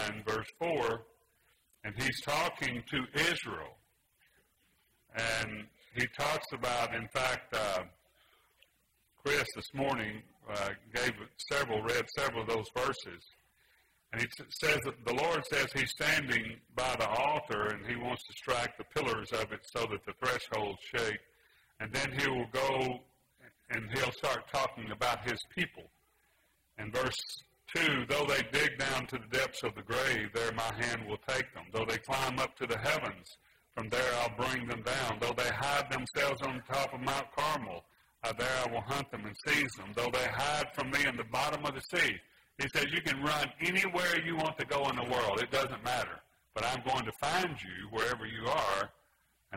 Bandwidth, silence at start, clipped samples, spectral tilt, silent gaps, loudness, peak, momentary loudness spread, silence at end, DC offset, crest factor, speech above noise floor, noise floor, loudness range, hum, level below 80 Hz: 16 kHz; 0 s; under 0.1%; -3.5 dB/octave; none; -34 LUFS; -14 dBFS; 9 LU; 0 s; under 0.1%; 22 dB; 40 dB; -74 dBFS; 4 LU; none; -60 dBFS